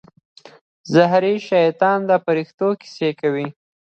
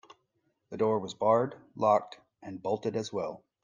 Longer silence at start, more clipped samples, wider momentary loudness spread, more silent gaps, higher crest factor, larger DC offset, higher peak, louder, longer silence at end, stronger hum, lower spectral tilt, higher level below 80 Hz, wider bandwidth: first, 0.85 s vs 0.7 s; neither; second, 8 LU vs 19 LU; first, 2.54-2.58 s vs none; about the same, 18 dB vs 20 dB; neither; first, 0 dBFS vs -12 dBFS; first, -18 LUFS vs -30 LUFS; first, 0.45 s vs 0.25 s; neither; about the same, -6.5 dB/octave vs -6.5 dB/octave; first, -68 dBFS vs -76 dBFS; second, 8 kHz vs 9.6 kHz